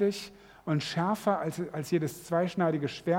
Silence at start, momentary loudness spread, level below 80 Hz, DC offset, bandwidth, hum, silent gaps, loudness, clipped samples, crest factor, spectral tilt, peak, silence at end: 0 s; 9 LU; -68 dBFS; under 0.1%; 17 kHz; none; none; -31 LUFS; under 0.1%; 18 dB; -6 dB/octave; -12 dBFS; 0 s